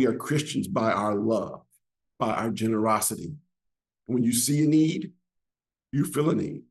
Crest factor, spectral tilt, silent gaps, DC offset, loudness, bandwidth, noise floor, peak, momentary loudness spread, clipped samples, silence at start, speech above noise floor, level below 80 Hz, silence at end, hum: 18 dB; -5 dB/octave; none; under 0.1%; -26 LUFS; 13 kHz; -89 dBFS; -10 dBFS; 12 LU; under 0.1%; 0 s; 64 dB; -66 dBFS; 0.1 s; none